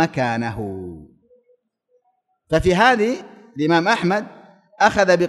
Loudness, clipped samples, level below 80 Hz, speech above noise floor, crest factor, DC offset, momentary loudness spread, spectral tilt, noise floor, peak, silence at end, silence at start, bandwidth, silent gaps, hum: -19 LUFS; under 0.1%; -44 dBFS; 50 dB; 18 dB; under 0.1%; 17 LU; -5.5 dB/octave; -68 dBFS; -2 dBFS; 0 s; 0 s; 12 kHz; none; none